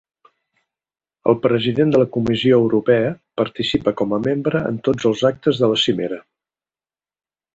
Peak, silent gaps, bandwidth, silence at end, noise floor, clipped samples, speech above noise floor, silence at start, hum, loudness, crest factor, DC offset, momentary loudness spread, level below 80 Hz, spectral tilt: -2 dBFS; none; 8 kHz; 1.35 s; under -90 dBFS; under 0.1%; over 73 dB; 1.25 s; none; -18 LUFS; 16 dB; under 0.1%; 8 LU; -52 dBFS; -6.5 dB/octave